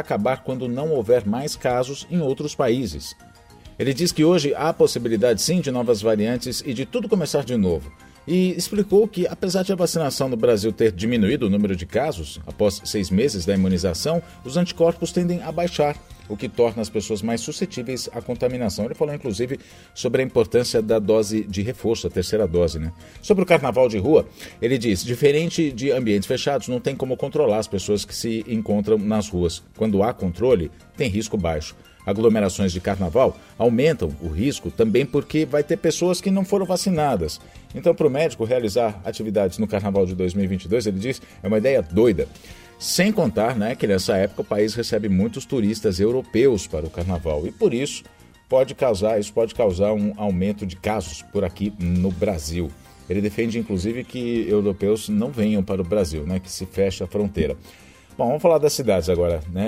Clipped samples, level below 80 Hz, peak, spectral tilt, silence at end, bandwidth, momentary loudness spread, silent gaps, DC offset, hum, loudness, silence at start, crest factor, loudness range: under 0.1%; -44 dBFS; -2 dBFS; -5.5 dB/octave; 0 s; 16 kHz; 8 LU; none; under 0.1%; none; -22 LUFS; 0 s; 20 dB; 3 LU